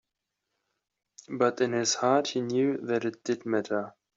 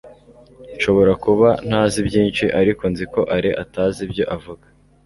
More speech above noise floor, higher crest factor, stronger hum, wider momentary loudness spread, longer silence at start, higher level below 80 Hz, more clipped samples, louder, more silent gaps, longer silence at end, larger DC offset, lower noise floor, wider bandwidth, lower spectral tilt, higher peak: first, 57 dB vs 27 dB; about the same, 20 dB vs 16 dB; neither; about the same, 8 LU vs 9 LU; first, 1.3 s vs 0.05 s; second, -76 dBFS vs -42 dBFS; neither; second, -28 LUFS vs -18 LUFS; neither; second, 0.25 s vs 0.5 s; neither; first, -85 dBFS vs -45 dBFS; second, 7.8 kHz vs 11.5 kHz; second, -4 dB/octave vs -6 dB/octave; second, -10 dBFS vs -2 dBFS